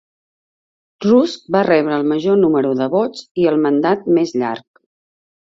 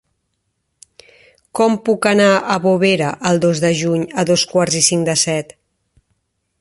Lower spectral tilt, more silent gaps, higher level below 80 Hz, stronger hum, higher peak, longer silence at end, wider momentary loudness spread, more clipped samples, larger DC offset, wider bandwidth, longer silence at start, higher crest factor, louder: first, -7 dB/octave vs -4 dB/octave; first, 3.31-3.35 s vs none; about the same, -60 dBFS vs -56 dBFS; neither; about the same, -2 dBFS vs 0 dBFS; second, 1 s vs 1.2 s; about the same, 8 LU vs 6 LU; neither; neither; second, 7.8 kHz vs 12 kHz; second, 1 s vs 1.55 s; about the same, 16 dB vs 18 dB; about the same, -16 LUFS vs -15 LUFS